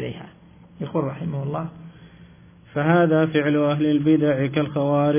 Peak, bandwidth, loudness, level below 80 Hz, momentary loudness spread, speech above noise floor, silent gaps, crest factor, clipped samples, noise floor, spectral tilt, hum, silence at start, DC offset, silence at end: -6 dBFS; 3.6 kHz; -21 LUFS; -56 dBFS; 14 LU; 28 dB; none; 16 dB; under 0.1%; -48 dBFS; -11.5 dB/octave; none; 0 s; under 0.1%; 0 s